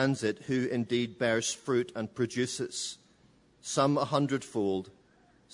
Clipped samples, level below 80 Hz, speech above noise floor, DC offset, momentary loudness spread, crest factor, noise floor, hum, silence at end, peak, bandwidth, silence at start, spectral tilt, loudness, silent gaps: under 0.1%; -70 dBFS; 33 dB; under 0.1%; 9 LU; 20 dB; -63 dBFS; none; 0.65 s; -12 dBFS; 11 kHz; 0 s; -4.5 dB/octave; -31 LUFS; none